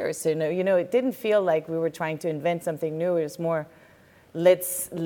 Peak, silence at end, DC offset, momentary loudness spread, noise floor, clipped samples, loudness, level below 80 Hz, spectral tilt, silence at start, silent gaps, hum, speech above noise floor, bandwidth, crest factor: -8 dBFS; 0 s; under 0.1%; 8 LU; -55 dBFS; under 0.1%; -25 LUFS; -70 dBFS; -5 dB/octave; 0 s; none; none; 30 dB; 18.5 kHz; 18 dB